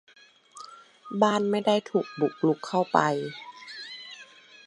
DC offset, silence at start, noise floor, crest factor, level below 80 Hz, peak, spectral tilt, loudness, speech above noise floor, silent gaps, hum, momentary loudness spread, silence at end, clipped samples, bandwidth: under 0.1%; 0.55 s; -51 dBFS; 24 dB; -78 dBFS; -4 dBFS; -5.5 dB/octave; -26 LUFS; 25 dB; none; none; 21 LU; 0.45 s; under 0.1%; 11.5 kHz